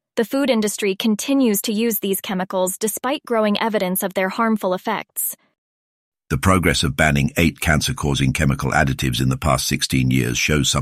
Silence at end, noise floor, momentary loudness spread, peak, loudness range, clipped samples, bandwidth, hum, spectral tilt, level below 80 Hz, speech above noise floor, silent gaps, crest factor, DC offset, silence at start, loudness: 0 s; under -90 dBFS; 5 LU; -2 dBFS; 3 LU; under 0.1%; 16 kHz; none; -4.5 dB/octave; -36 dBFS; over 71 dB; 5.58-6.12 s; 18 dB; under 0.1%; 0.15 s; -19 LUFS